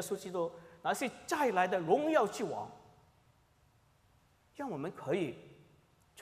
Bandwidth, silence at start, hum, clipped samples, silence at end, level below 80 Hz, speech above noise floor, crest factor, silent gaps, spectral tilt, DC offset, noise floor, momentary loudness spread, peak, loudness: 15.5 kHz; 0 s; none; under 0.1%; 0 s; -76 dBFS; 34 dB; 20 dB; none; -4.5 dB/octave; under 0.1%; -69 dBFS; 12 LU; -16 dBFS; -35 LUFS